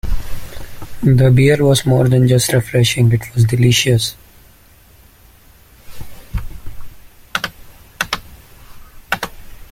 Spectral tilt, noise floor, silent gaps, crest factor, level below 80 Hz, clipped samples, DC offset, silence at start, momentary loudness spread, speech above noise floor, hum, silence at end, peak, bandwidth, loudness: -5.5 dB/octave; -46 dBFS; none; 16 dB; -32 dBFS; under 0.1%; under 0.1%; 0.05 s; 18 LU; 34 dB; none; 0.05 s; 0 dBFS; 16 kHz; -14 LUFS